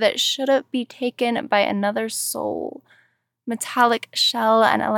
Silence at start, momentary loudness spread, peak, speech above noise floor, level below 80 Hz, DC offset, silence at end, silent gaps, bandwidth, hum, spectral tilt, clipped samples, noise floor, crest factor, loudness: 0 s; 11 LU; -4 dBFS; 28 dB; -72 dBFS; under 0.1%; 0 s; none; 19 kHz; none; -2.5 dB/octave; under 0.1%; -49 dBFS; 18 dB; -21 LUFS